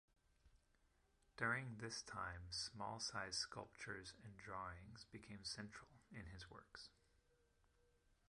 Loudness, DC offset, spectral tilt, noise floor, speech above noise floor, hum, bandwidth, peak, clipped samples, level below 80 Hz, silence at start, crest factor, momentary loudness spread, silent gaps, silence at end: -50 LUFS; under 0.1%; -3 dB/octave; -79 dBFS; 28 dB; none; 11.5 kHz; -28 dBFS; under 0.1%; -70 dBFS; 0.45 s; 24 dB; 14 LU; none; 1.4 s